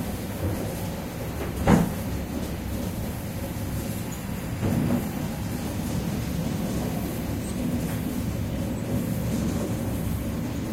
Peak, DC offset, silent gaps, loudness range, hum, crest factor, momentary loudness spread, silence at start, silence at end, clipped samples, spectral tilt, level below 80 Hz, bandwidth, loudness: -4 dBFS; under 0.1%; none; 2 LU; none; 22 dB; 7 LU; 0 s; 0 s; under 0.1%; -6.5 dB/octave; -38 dBFS; 16 kHz; -28 LUFS